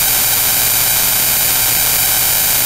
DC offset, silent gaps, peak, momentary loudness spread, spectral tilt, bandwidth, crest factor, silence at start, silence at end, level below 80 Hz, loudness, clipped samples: under 0.1%; none; 0 dBFS; 0 LU; 0 dB/octave; over 20 kHz; 14 dB; 0 s; 0 s; -36 dBFS; -10 LUFS; 0.2%